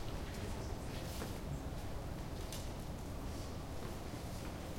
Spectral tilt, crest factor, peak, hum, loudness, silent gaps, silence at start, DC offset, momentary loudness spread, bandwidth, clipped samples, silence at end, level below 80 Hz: -5.5 dB/octave; 14 dB; -30 dBFS; none; -45 LUFS; none; 0 s; under 0.1%; 2 LU; 16.5 kHz; under 0.1%; 0 s; -48 dBFS